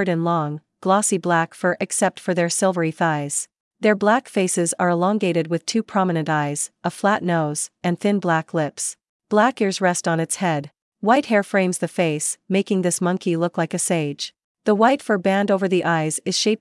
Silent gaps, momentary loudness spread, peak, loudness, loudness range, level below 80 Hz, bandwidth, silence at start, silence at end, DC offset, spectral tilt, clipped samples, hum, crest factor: 3.60-3.71 s, 9.09-9.20 s, 10.82-10.92 s, 14.44-14.55 s; 6 LU; -4 dBFS; -21 LUFS; 1 LU; -76 dBFS; 12 kHz; 0 s; 0.05 s; under 0.1%; -4.5 dB/octave; under 0.1%; none; 16 dB